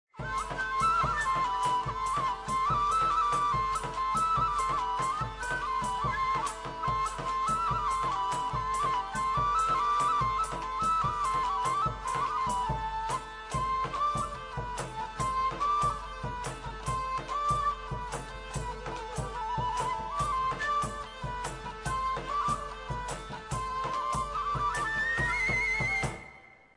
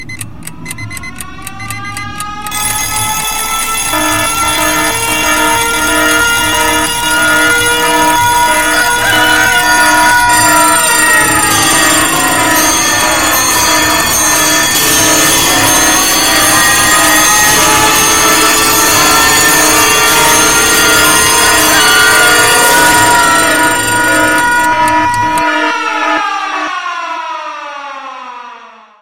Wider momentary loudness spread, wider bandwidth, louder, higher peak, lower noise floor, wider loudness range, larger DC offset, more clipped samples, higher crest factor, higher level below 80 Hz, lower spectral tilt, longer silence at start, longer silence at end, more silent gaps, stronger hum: second, 10 LU vs 15 LU; second, 10 kHz vs over 20 kHz; second, -31 LUFS vs -7 LUFS; second, -18 dBFS vs 0 dBFS; first, -53 dBFS vs -34 dBFS; second, 5 LU vs 8 LU; second, under 0.1% vs 2%; second, under 0.1% vs 0.2%; about the same, 12 dB vs 10 dB; second, -46 dBFS vs -34 dBFS; first, -4 dB/octave vs -1 dB/octave; first, 0.15 s vs 0 s; first, 0.2 s vs 0 s; neither; neither